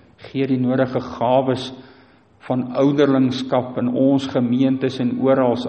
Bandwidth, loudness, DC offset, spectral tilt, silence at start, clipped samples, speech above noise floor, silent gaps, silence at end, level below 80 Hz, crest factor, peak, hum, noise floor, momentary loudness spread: 8.4 kHz; -19 LUFS; under 0.1%; -7.5 dB/octave; 0.2 s; under 0.1%; 33 dB; none; 0 s; -58 dBFS; 16 dB; -4 dBFS; none; -51 dBFS; 8 LU